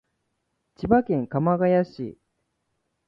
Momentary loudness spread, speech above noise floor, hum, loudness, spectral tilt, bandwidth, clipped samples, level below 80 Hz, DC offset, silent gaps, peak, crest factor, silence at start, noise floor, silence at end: 15 LU; 54 dB; none; -23 LUFS; -10.5 dB/octave; 5.8 kHz; under 0.1%; -52 dBFS; under 0.1%; none; -6 dBFS; 20 dB; 0.8 s; -76 dBFS; 0.95 s